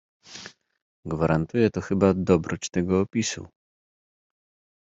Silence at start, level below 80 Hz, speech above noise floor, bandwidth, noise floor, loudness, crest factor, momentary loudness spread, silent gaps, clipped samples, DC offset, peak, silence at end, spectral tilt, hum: 0.3 s; -54 dBFS; 22 dB; 8 kHz; -45 dBFS; -24 LUFS; 20 dB; 19 LU; 0.82-1.03 s; under 0.1%; under 0.1%; -6 dBFS; 1.35 s; -6 dB/octave; none